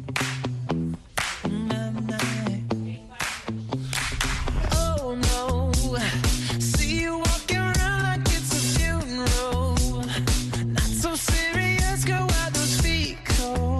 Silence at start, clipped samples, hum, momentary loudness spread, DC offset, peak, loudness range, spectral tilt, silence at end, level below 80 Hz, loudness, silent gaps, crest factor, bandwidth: 0 s; under 0.1%; none; 6 LU; under 0.1%; -8 dBFS; 5 LU; -4 dB/octave; 0 s; -30 dBFS; -25 LUFS; none; 16 dB; 12.5 kHz